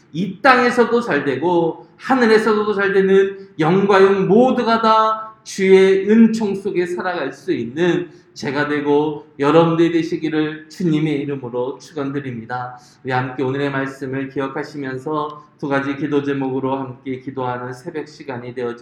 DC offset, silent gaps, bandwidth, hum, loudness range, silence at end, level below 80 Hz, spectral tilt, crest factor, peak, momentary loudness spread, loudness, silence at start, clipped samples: under 0.1%; none; 11 kHz; none; 9 LU; 0 s; -62 dBFS; -6.5 dB/octave; 18 dB; 0 dBFS; 15 LU; -18 LUFS; 0.15 s; under 0.1%